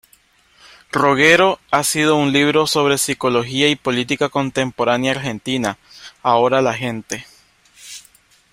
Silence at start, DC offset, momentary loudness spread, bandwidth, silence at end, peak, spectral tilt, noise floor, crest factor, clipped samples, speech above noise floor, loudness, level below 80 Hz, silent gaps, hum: 0.95 s; under 0.1%; 14 LU; 16 kHz; 0.5 s; 0 dBFS; -3.5 dB/octave; -55 dBFS; 18 dB; under 0.1%; 38 dB; -17 LUFS; -56 dBFS; none; none